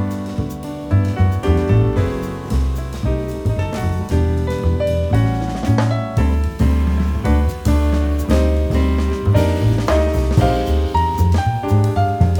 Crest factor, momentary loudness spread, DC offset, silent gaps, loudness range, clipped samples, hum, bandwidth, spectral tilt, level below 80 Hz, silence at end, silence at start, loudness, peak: 16 dB; 6 LU; under 0.1%; none; 3 LU; under 0.1%; none; 17.5 kHz; -7.5 dB/octave; -22 dBFS; 0 s; 0 s; -18 LUFS; -2 dBFS